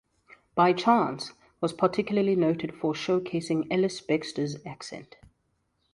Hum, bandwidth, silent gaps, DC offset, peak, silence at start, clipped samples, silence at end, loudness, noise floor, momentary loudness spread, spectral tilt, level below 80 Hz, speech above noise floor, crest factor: none; 11.5 kHz; none; under 0.1%; -8 dBFS; 0.55 s; under 0.1%; 0.9 s; -27 LUFS; -74 dBFS; 16 LU; -6 dB/octave; -66 dBFS; 47 dB; 20 dB